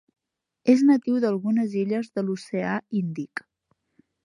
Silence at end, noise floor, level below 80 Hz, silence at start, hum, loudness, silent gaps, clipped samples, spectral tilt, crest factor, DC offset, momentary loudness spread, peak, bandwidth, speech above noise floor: 0.85 s; -73 dBFS; -74 dBFS; 0.65 s; none; -24 LUFS; none; under 0.1%; -7.5 dB/octave; 18 dB; under 0.1%; 12 LU; -6 dBFS; 11 kHz; 50 dB